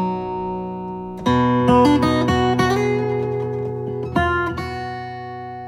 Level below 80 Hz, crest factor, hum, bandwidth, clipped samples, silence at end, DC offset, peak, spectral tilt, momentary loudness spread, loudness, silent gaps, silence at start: -40 dBFS; 18 dB; none; 13.5 kHz; under 0.1%; 0 s; under 0.1%; -2 dBFS; -7 dB/octave; 14 LU; -20 LUFS; none; 0 s